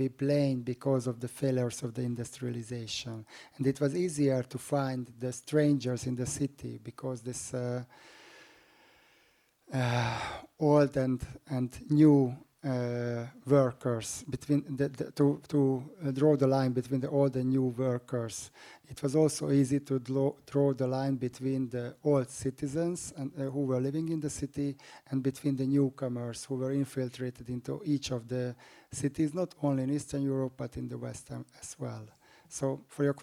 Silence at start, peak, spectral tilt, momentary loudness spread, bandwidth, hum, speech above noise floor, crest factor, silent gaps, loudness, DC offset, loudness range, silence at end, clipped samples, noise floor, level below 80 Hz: 0 s; -12 dBFS; -6.5 dB/octave; 12 LU; 15 kHz; none; 37 dB; 20 dB; none; -32 LUFS; under 0.1%; 7 LU; 0 s; under 0.1%; -68 dBFS; -62 dBFS